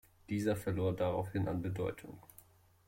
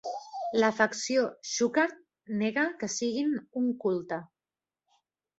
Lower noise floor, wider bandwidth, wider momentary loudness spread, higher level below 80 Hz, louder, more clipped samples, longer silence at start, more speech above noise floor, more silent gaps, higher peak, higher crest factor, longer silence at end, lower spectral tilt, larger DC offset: second, -63 dBFS vs under -90 dBFS; first, 16.5 kHz vs 8.2 kHz; first, 15 LU vs 11 LU; first, -62 dBFS vs -76 dBFS; second, -37 LUFS vs -30 LUFS; neither; first, 0.3 s vs 0.05 s; second, 27 dB vs over 61 dB; neither; second, -22 dBFS vs -10 dBFS; second, 16 dB vs 22 dB; second, 0.65 s vs 1.15 s; first, -7.5 dB/octave vs -3.5 dB/octave; neither